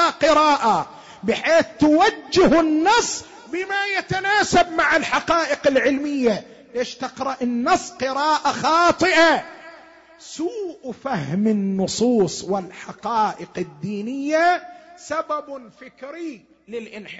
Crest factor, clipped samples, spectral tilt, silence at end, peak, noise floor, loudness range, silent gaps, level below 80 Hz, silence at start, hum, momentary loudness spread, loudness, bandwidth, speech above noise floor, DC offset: 14 dB; under 0.1%; -4 dB/octave; 0 s; -8 dBFS; -46 dBFS; 6 LU; none; -52 dBFS; 0 s; none; 17 LU; -20 LUFS; 8 kHz; 26 dB; under 0.1%